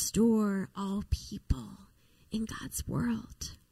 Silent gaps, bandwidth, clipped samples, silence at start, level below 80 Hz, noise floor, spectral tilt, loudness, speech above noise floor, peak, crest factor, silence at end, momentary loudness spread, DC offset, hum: none; 15.5 kHz; under 0.1%; 0 s; -44 dBFS; -60 dBFS; -5.5 dB/octave; -33 LUFS; 28 dB; -14 dBFS; 18 dB; 0.15 s; 13 LU; under 0.1%; none